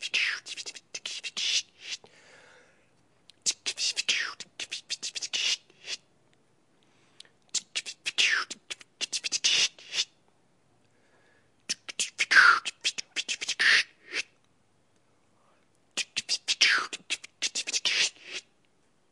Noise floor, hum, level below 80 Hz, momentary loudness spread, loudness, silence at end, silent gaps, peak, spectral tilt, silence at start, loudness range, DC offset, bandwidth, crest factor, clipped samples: -70 dBFS; none; -86 dBFS; 17 LU; -27 LUFS; 0.7 s; none; -6 dBFS; 2.5 dB/octave; 0 s; 8 LU; under 0.1%; 11.5 kHz; 26 dB; under 0.1%